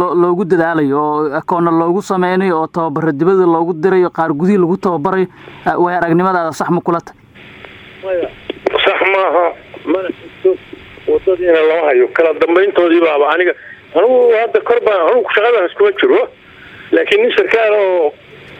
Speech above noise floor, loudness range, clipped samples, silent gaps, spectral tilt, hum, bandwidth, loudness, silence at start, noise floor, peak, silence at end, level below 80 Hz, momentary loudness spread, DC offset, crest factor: 24 dB; 5 LU; under 0.1%; none; -6.5 dB/octave; none; 11 kHz; -13 LUFS; 0 s; -36 dBFS; 0 dBFS; 0 s; -54 dBFS; 8 LU; under 0.1%; 14 dB